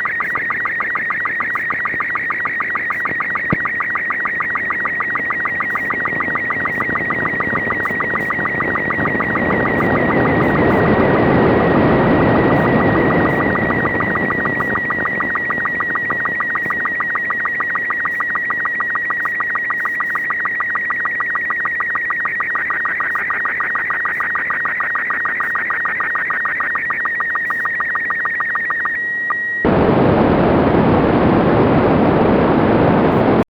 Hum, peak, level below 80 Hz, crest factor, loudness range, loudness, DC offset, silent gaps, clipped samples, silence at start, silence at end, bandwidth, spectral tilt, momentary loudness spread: none; -6 dBFS; -38 dBFS; 10 dB; 4 LU; -16 LUFS; under 0.1%; none; under 0.1%; 0 s; 0.05 s; over 20 kHz; -8.5 dB/octave; 5 LU